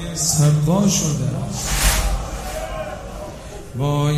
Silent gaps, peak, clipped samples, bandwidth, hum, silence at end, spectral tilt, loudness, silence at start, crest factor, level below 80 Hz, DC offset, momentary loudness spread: none; -2 dBFS; under 0.1%; 15.5 kHz; none; 0 s; -4.5 dB/octave; -20 LUFS; 0 s; 18 dB; -28 dBFS; under 0.1%; 17 LU